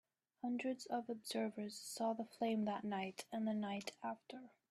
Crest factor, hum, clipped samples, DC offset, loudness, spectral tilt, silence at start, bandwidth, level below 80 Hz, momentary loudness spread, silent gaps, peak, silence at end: 16 dB; none; under 0.1%; under 0.1%; -44 LUFS; -4.5 dB/octave; 0.45 s; 13.5 kHz; -88 dBFS; 8 LU; none; -28 dBFS; 0.2 s